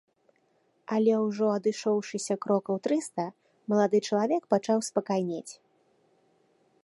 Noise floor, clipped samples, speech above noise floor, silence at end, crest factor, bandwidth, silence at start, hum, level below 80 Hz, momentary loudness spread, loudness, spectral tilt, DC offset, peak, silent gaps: -70 dBFS; under 0.1%; 43 dB; 1.3 s; 20 dB; 11.5 kHz; 0.9 s; none; -82 dBFS; 11 LU; -28 LUFS; -5.5 dB/octave; under 0.1%; -10 dBFS; none